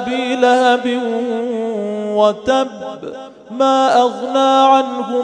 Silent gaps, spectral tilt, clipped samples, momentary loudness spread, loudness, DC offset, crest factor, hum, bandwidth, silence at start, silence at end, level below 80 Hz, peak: none; -4 dB/octave; under 0.1%; 16 LU; -15 LUFS; under 0.1%; 16 dB; none; 9.8 kHz; 0 s; 0 s; -58 dBFS; 0 dBFS